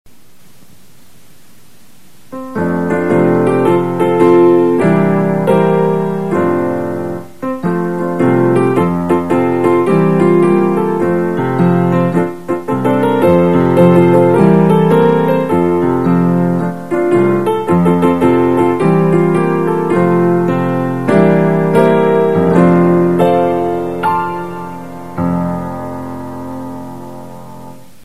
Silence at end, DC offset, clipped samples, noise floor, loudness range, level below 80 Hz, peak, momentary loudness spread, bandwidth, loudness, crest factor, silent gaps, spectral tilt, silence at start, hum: 0.3 s; 2%; under 0.1%; -47 dBFS; 6 LU; -48 dBFS; 0 dBFS; 14 LU; 13.5 kHz; -12 LUFS; 12 dB; none; -8.5 dB/octave; 2.3 s; none